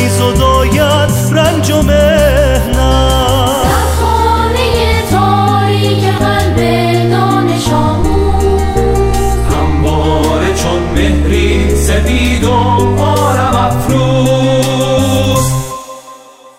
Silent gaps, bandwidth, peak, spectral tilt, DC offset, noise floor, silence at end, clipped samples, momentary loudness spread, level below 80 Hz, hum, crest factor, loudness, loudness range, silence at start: none; 16.5 kHz; 0 dBFS; -5.5 dB/octave; under 0.1%; -35 dBFS; 0.4 s; under 0.1%; 3 LU; -18 dBFS; none; 10 dB; -11 LUFS; 2 LU; 0 s